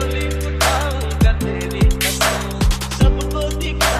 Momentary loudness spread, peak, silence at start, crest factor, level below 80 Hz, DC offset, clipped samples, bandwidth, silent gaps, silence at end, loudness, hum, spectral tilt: 5 LU; -2 dBFS; 0 s; 16 dB; -20 dBFS; under 0.1%; under 0.1%; 16 kHz; none; 0 s; -18 LUFS; none; -4.5 dB/octave